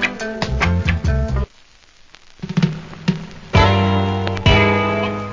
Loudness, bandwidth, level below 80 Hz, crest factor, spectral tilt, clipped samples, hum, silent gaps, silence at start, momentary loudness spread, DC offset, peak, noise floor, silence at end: -18 LUFS; 7.6 kHz; -26 dBFS; 18 dB; -6.5 dB/octave; under 0.1%; none; none; 0 s; 11 LU; under 0.1%; 0 dBFS; -48 dBFS; 0 s